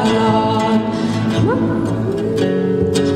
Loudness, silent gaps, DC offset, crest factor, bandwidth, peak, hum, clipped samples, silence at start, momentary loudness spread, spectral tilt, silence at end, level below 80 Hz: -16 LUFS; none; under 0.1%; 12 dB; 12.5 kHz; -4 dBFS; none; under 0.1%; 0 s; 4 LU; -6.5 dB/octave; 0 s; -44 dBFS